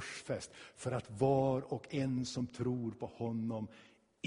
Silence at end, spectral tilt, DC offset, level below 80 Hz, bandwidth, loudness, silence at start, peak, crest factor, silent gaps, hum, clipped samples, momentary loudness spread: 0 s; -6.5 dB/octave; under 0.1%; -66 dBFS; 10.5 kHz; -38 LUFS; 0 s; -18 dBFS; 18 dB; none; none; under 0.1%; 11 LU